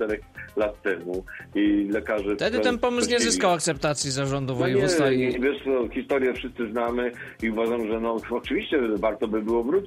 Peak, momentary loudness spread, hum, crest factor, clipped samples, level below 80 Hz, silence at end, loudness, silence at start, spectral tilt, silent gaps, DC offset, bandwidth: -8 dBFS; 8 LU; none; 16 dB; under 0.1%; -48 dBFS; 0 s; -25 LUFS; 0 s; -4.5 dB/octave; none; under 0.1%; 15.5 kHz